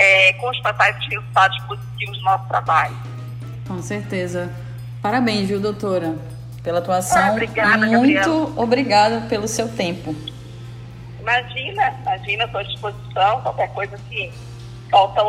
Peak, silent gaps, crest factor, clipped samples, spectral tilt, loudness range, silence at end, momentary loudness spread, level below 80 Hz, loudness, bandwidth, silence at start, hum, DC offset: -2 dBFS; none; 18 dB; under 0.1%; -4.5 dB/octave; 6 LU; 0 s; 17 LU; -48 dBFS; -19 LUFS; 15.5 kHz; 0 s; none; under 0.1%